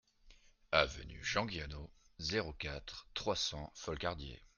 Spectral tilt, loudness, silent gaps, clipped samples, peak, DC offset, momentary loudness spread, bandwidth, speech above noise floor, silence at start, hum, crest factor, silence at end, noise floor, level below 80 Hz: -3.5 dB/octave; -39 LUFS; none; under 0.1%; -12 dBFS; under 0.1%; 14 LU; 10.5 kHz; 22 dB; 0.25 s; none; 28 dB; 0.1 s; -64 dBFS; -54 dBFS